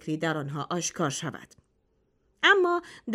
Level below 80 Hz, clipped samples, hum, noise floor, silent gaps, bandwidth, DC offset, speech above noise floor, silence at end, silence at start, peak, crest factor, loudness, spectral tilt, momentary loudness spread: -70 dBFS; under 0.1%; none; -70 dBFS; none; 14.5 kHz; under 0.1%; 43 dB; 0 s; 0.05 s; -8 dBFS; 22 dB; -26 LUFS; -3.5 dB/octave; 14 LU